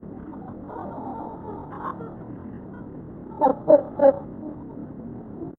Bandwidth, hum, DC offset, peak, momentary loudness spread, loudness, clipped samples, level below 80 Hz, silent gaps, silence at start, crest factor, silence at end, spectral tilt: 4.1 kHz; none; under 0.1%; -4 dBFS; 20 LU; -23 LUFS; under 0.1%; -54 dBFS; none; 0 s; 22 dB; 0.05 s; -11.5 dB/octave